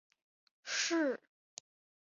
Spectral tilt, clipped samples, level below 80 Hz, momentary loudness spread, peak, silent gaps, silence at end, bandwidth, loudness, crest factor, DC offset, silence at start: 0.5 dB/octave; under 0.1%; under -90 dBFS; 21 LU; -22 dBFS; none; 1 s; 7.4 kHz; -35 LUFS; 18 dB; under 0.1%; 0.65 s